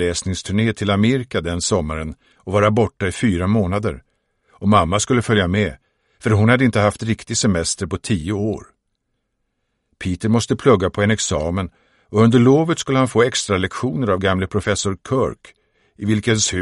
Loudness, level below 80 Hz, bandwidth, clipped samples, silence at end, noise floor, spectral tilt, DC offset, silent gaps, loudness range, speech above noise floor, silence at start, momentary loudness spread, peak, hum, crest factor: -18 LUFS; -42 dBFS; 11.5 kHz; under 0.1%; 0 s; -72 dBFS; -5 dB/octave; under 0.1%; none; 4 LU; 55 dB; 0 s; 10 LU; 0 dBFS; none; 18 dB